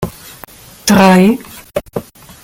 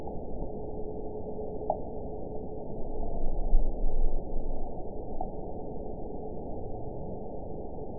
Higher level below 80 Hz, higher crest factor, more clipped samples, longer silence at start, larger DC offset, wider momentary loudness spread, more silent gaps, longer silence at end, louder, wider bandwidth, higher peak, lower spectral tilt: second, -42 dBFS vs -32 dBFS; about the same, 14 dB vs 18 dB; neither; about the same, 0 s vs 0 s; second, under 0.1% vs 1%; first, 21 LU vs 6 LU; neither; first, 0.45 s vs 0 s; first, -11 LUFS vs -38 LUFS; first, 17 kHz vs 1 kHz; first, 0 dBFS vs -10 dBFS; second, -5.5 dB/octave vs -15 dB/octave